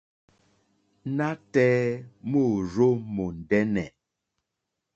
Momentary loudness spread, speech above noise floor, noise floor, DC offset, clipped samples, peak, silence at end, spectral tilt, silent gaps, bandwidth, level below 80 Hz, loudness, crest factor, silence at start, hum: 10 LU; 59 dB; -83 dBFS; under 0.1%; under 0.1%; -8 dBFS; 1.05 s; -8 dB/octave; none; 7.8 kHz; -56 dBFS; -26 LUFS; 20 dB; 1.05 s; none